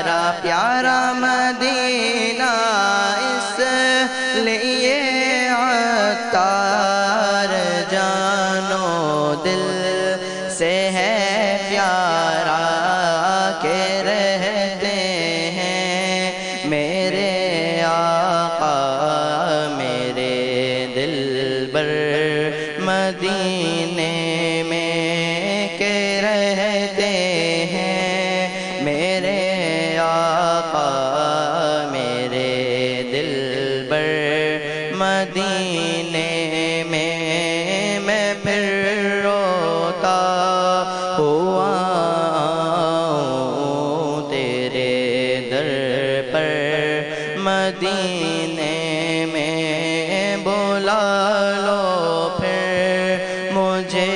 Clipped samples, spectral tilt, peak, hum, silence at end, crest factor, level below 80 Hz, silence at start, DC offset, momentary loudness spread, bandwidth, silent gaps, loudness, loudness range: under 0.1%; -4 dB/octave; -4 dBFS; none; 0 s; 16 dB; -58 dBFS; 0 s; under 0.1%; 4 LU; 10.5 kHz; none; -19 LUFS; 3 LU